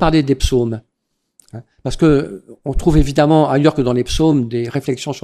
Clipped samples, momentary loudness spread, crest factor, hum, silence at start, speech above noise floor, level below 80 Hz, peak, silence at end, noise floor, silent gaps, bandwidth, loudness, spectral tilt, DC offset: under 0.1%; 14 LU; 16 dB; none; 0 s; 58 dB; -26 dBFS; 0 dBFS; 0.05 s; -72 dBFS; none; 14 kHz; -15 LUFS; -6.5 dB/octave; under 0.1%